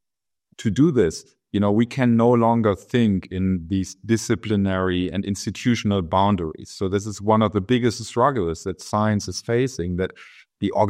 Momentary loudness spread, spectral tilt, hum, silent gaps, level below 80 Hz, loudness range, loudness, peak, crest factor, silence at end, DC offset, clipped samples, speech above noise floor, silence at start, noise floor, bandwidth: 9 LU; -6.5 dB/octave; none; none; -52 dBFS; 3 LU; -22 LUFS; -4 dBFS; 16 dB; 0 s; under 0.1%; under 0.1%; 66 dB; 0.6 s; -87 dBFS; 13.5 kHz